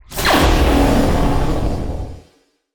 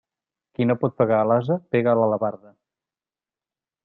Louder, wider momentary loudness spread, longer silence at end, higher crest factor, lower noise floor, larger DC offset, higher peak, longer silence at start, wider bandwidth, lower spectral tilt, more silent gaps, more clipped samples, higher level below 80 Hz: first, -16 LUFS vs -22 LUFS; first, 14 LU vs 7 LU; second, 0.55 s vs 1.5 s; about the same, 14 dB vs 18 dB; second, -56 dBFS vs under -90 dBFS; neither; first, -2 dBFS vs -6 dBFS; second, 0.1 s vs 0.6 s; first, over 20 kHz vs 4.3 kHz; second, -5.5 dB/octave vs -11 dB/octave; neither; neither; first, -20 dBFS vs -66 dBFS